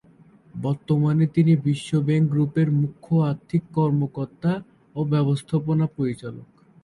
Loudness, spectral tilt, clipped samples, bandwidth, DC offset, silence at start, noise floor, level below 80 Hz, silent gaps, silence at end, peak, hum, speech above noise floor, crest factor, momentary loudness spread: -23 LUFS; -8.5 dB/octave; under 0.1%; 11 kHz; under 0.1%; 0.55 s; -53 dBFS; -58 dBFS; none; 0.4 s; -8 dBFS; none; 31 dB; 14 dB; 11 LU